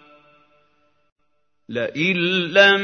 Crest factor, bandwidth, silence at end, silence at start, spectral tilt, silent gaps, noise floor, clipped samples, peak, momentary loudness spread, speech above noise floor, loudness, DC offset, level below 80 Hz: 22 dB; 6.6 kHz; 0 s; 1.7 s; -4.5 dB/octave; none; -73 dBFS; under 0.1%; 0 dBFS; 13 LU; 55 dB; -18 LUFS; under 0.1%; -72 dBFS